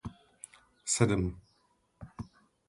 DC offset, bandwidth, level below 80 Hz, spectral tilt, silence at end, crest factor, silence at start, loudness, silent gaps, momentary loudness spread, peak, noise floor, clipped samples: under 0.1%; 11.5 kHz; -52 dBFS; -4.5 dB/octave; 0.45 s; 24 dB; 0.05 s; -31 LUFS; none; 24 LU; -10 dBFS; -72 dBFS; under 0.1%